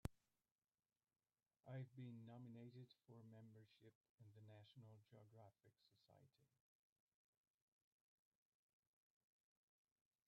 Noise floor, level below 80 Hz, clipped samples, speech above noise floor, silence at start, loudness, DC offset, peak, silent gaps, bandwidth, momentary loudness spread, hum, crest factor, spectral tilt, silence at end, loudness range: under -90 dBFS; -78 dBFS; under 0.1%; over 25 dB; 0.05 s; -62 LUFS; under 0.1%; -30 dBFS; 0.52-0.56 s, 3.95-4.01 s, 4.09-4.18 s; 5.2 kHz; 11 LU; none; 34 dB; -7 dB/octave; 3.8 s; 6 LU